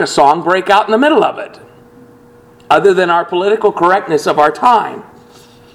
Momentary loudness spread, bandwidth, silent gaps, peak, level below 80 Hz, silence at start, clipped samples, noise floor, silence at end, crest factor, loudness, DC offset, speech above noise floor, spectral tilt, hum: 7 LU; 13.5 kHz; none; 0 dBFS; -54 dBFS; 0 s; 0.2%; -42 dBFS; 0.75 s; 12 dB; -11 LUFS; under 0.1%; 31 dB; -4.5 dB/octave; none